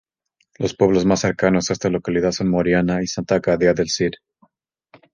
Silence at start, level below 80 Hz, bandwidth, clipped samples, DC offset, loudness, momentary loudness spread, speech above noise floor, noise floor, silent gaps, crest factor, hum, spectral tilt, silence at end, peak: 0.6 s; -46 dBFS; 9.8 kHz; under 0.1%; under 0.1%; -19 LUFS; 6 LU; 50 dB; -69 dBFS; none; 18 dB; none; -5.5 dB/octave; 1 s; -2 dBFS